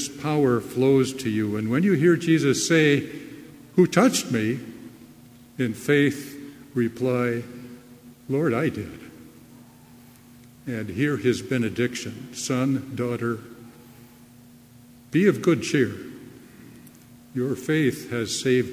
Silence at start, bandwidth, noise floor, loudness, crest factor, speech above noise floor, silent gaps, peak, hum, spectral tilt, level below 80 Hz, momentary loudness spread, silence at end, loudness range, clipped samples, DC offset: 0 s; 16 kHz; -50 dBFS; -23 LUFS; 20 dB; 27 dB; none; -4 dBFS; none; -5.5 dB/octave; -58 dBFS; 21 LU; 0 s; 8 LU; under 0.1%; under 0.1%